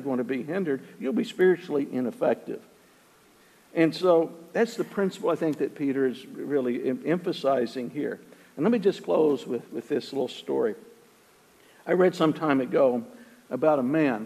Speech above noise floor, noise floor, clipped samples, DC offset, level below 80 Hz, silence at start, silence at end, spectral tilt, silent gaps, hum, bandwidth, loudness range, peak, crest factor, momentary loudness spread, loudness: 32 dB; -58 dBFS; under 0.1%; under 0.1%; -78 dBFS; 0 s; 0 s; -6.5 dB/octave; none; none; 14.5 kHz; 2 LU; -8 dBFS; 20 dB; 11 LU; -26 LUFS